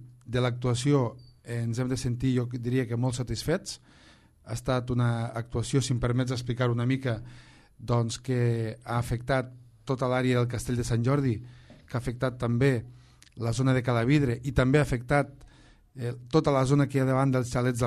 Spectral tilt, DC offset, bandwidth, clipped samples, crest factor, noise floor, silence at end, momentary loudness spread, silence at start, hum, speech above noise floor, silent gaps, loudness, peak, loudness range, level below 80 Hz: -6.5 dB/octave; under 0.1%; 13 kHz; under 0.1%; 18 dB; -56 dBFS; 0 s; 12 LU; 0 s; none; 29 dB; none; -28 LUFS; -8 dBFS; 4 LU; -48 dBFS